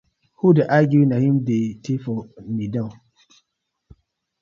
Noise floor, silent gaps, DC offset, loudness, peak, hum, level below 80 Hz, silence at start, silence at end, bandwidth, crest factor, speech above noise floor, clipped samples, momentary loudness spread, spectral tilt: -76 dBFS; none; under 0.1%; -20 LUFS; -2 dBFS; none; -58 dBFS; 0.45 s; 1.5 s; 7.2 kHz; 18 dB; 57 dB; under 0.1%; 14 LU; -9 dB/octave